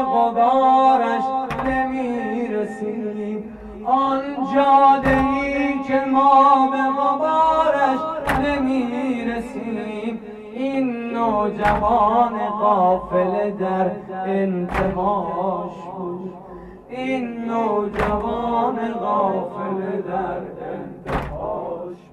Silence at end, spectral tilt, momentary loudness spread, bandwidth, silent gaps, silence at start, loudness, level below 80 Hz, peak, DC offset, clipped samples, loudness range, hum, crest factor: 0.15 s; -7 dB/octave; 15 LU; 12.5 kHz; none; 0 s; -20 LUFS; -42 dBFS; -4 dBFS; under 0.1%; under 0.1%; 8 LU; none; 16 dB